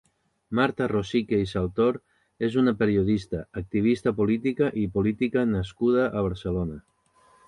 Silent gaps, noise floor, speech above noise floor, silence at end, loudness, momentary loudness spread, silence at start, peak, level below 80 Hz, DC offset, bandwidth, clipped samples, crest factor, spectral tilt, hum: none; -61 dBFS; 36 dB; 0.65 s; -25 LUFS; 8 LU; 0.5 s; -8 dBFS; -46 dBFS; under 0.1%; 11 kHz; under 0.1%; 18 dB; -8 dB/octave; none